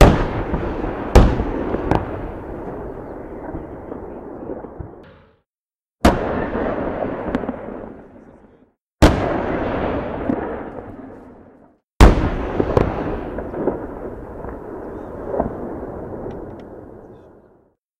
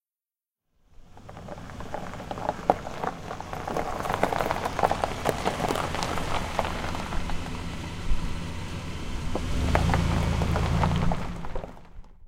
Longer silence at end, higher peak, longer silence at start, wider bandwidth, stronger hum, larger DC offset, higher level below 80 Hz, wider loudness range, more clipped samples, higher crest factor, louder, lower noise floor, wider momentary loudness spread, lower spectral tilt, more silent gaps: first, 0.7 s vs 0 s; about the same, 0 dBFS vs -2 dBFS; second, 0 s vs 1 s; about the same, 15.5 kHz vs 16.5 kHz; neither; neither; first, -26 dBFS vs -34 dBFS; first, 10 LU vs 5 LU; neither; second, 20 dB vs 26 dB; first, -22 LUFS vs -29 LUFS; about the same, under -90 dBFS vs under -90 dBFS; first, 19 LU vs 13 LU; first, -7 dB/octave vs -5.5 dB/octave; first, 5.58-5.69 s, 8.81-8.96 s, 11.84-11.97 s vs none